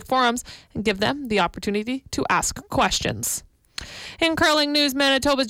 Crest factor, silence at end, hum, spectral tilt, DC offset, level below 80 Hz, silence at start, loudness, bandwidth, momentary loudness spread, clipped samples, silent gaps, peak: 14 dB; 0 s; none; -3 dB/octave; under 0.1%; -46 dBFS; 0 s; -22 LUFS; 17 kHz; 16 LU; under 0.1%; none; -10 dBFS